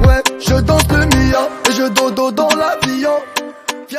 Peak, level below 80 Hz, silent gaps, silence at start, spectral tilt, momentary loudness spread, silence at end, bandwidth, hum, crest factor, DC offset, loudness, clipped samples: 0 dBFS; -22 dBFS; none; 0 s; -4.5 dB/octave; 8 LU; 0 s; 16 kHz; none; 14 dB; under 0.1%; -14 LUFS; under 0.1%